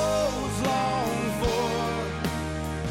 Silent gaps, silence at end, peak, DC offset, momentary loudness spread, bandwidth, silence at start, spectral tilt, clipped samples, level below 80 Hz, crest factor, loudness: none; 0 s; -14 dBFS; under 0.1%; 5 LU; 16.5 kHz; 0 s; -5 dB/octave; under 0.1%; -40 dBFS; 14 dB; -27 LUFS